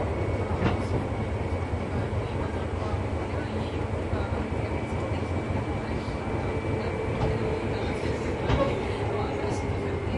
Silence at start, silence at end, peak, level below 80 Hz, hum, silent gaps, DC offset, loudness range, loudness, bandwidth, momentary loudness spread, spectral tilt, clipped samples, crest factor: 0 s; 0 s; -12 dBFS; -36 dBFS; none; none; under 0.1%; 2 LU; -29 LUFS; 11.5 kHz; 4 LU; -7.5 dB/octave; under 0.1%; 16 dB